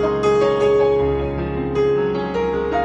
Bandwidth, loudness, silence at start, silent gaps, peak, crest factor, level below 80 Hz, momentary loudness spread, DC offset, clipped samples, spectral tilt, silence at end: 8.2 kHz; -19 LUFS; 0 s; none; -6 dBFS; 12 dB; -34 dBFS; 6 LU; under 0.1%; under 0.1%; -7 dB/octave; 0 s